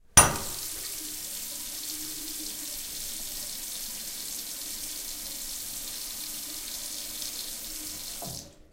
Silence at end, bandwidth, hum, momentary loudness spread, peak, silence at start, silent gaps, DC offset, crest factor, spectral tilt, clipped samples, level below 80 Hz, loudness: 0.05 s; 16 kHz; none; 2 LU; -2 dBFS; 0.1 s; none; under 0.1%; 30 dB; -1 dB/octave; under 0.1%; -50 dBFS; -31 LUFS